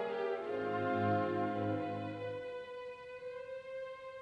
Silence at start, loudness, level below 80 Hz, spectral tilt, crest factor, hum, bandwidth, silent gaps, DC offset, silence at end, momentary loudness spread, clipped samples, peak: 0 s; -39 LUFS; -76 dBFS; -8 dB/octave; 16 dB; none; 9.8 kHz; none; under 0.1%; 0 s; 13 LU; under 0.1%; -22 dBFS